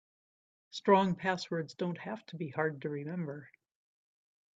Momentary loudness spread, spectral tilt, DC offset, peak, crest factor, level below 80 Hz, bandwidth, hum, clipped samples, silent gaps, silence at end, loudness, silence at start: 15 LU; -6.5 dB/octave; under 0.1%; -12 dBFS; 22 dB; -76 dBFS; 7.8 kHz; none; under 0.1%; none; 1.1 s; -34 LUFS; 0.75 s